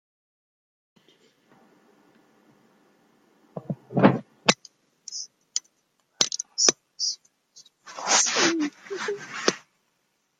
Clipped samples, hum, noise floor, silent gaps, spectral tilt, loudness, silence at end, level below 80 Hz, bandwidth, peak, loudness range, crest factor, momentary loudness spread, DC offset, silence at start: under 0.1%; none; -73 dBFS; none; -2.5 dB/octave; -24 LUFS; 0.8 s; -74 dBFS; 12.5 kHz; 0 dBFS; 5 LU; 28 dB; 17 LU; under 0.1%; 3.55 s